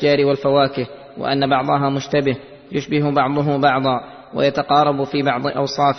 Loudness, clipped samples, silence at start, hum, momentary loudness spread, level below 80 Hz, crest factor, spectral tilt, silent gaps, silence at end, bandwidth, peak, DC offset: -18 LUFS; under 0.1%; 0 s; none; 11 LU; -54 dBFS; 16 dB; -6.5 dB/octave; none; 0 s; 6.4 kHz; -2 dBFS; under 0.1%